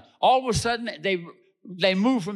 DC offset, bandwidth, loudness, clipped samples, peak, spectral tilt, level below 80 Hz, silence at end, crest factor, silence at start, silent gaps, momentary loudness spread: under 0.1%; 13 kHz; -24 LUFS; under 0.1%; -10 dBFS; -4.5 dB/octave; -50 dBFS; 0 s; 16 dB; 0.2 s; none; 7 LU